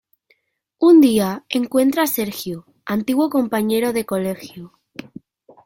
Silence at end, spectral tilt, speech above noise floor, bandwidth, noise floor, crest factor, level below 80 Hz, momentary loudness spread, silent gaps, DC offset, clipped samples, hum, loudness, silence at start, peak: 1 s; -5 dB/octave; 50 dB; 17 kHz; -67 dBFS; 16 dB; -60 dBFS; 23 LU; none; under 0.1%; under 0.1%; none; -18 LUFS; 0.8 s; -4 dBFS